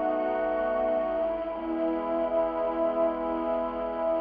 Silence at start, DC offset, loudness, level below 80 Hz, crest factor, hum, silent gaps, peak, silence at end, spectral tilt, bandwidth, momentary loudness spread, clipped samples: 0 s; under 0.1%; -28 LUFS; -54 dBFS; 12 dB; none; none; -16 dBFS; 0 s; -4 dB/octave; 4.9 kHz; 3 LU; under 0.1%